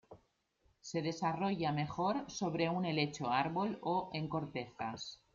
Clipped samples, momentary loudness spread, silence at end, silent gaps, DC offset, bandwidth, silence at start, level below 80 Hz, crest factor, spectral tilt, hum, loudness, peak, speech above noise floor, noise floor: under 0.1%; 8 LU; 0.2 s; none; under 0.1%; 7.6 kHz; 0.1 s; -70 dBFS; 18 dB; -5.5 dB/octave; none; -37 LUFS; -20 dBFS; 39 dB; -76 dBFS